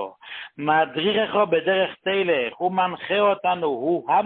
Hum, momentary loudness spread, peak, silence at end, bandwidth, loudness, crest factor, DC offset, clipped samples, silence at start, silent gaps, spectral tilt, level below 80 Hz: none; 5 LU; -6 dBFS; 0 s; 4.4 kHz; -22 LUFS; 16 dB; under 0.1%; under 0.1%; 0 s; none; -9.5 dB/octave; -66 dBFS